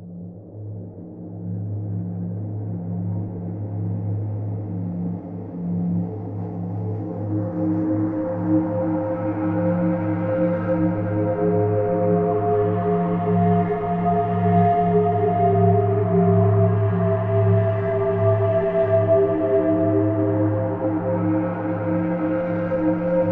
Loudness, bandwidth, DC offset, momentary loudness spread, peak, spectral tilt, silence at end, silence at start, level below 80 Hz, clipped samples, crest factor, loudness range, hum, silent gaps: -22 LUFS; 3.5 kHz; under 0.1%; 11 LU; -6 dBFS; -12.5 dB/octave; 0 s; 0 s; -50 dBFS; under 0.1%; 14 dB; 9 LU; none; none